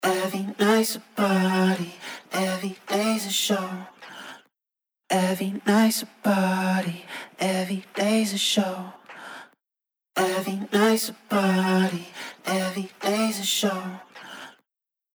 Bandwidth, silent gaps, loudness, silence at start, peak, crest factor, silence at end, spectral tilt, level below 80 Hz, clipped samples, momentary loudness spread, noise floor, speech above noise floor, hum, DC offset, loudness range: over 20 kHz; none; -24 LUFS; 0 s; -8 dBFS; 18 dB; 0.65 s; -4.5 dB/octave; -78 dBFS; under 0.1%; 19 LU; -89 dBFS; 65 dB; none; under 0.1%; 3 LU